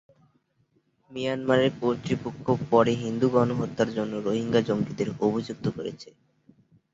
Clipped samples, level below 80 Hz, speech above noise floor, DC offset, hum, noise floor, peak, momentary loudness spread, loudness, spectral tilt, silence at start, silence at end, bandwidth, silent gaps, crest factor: under 0.1%; -60 dBFS; 43 dB; under 0.1%; none; -69 dBFS; -6 dBFS; 9 LU; -26 LUFS; -7 dB/octave; 1.1 s; 0.85 s; 7.8 kHz; none; 20 dB